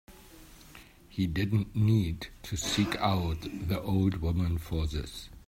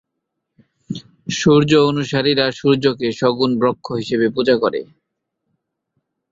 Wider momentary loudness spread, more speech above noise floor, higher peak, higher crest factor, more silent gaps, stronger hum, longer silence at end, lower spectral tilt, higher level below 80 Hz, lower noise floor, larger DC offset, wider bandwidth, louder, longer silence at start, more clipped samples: about the same, 12 LU vs 14 LU; second, 23 dB vs 61 dB; second, -12 dBFS vs -2 dBFS; about the same, 18 dB vs 18 dB; neither; neither; second, 0.1 s vs 1.5 s; about the same, -6 dB/octave vs -5.5 dB/octave; first, -44 dBFS vs -54 dBFS; second, -53 dBFS vs -77 dBFS; neither; first, 16 kHz vs 7.8 kHz; second, -30 LUFS vs -17 LUFS; second, 0.1 s vs 0.9 s; neither